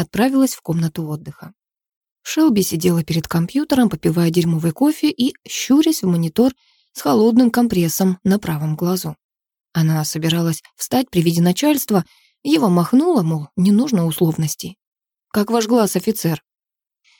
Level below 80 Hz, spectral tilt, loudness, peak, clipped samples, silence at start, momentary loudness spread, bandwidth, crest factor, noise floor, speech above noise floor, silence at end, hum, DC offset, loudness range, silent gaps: -52 dBFS; -6 dB/octave; -18 LUFS; -4 dBFS; under 0.1%; 0 s; 9 LU; 19 kHz; 14 dB; -89 dBFS; 72 dB; 0.8 s; none; under 0.1%; 3 LU; 1.96-2.01 s, 2.11-2.16 s, 9.24-9.29 s, 14.87-14.92 s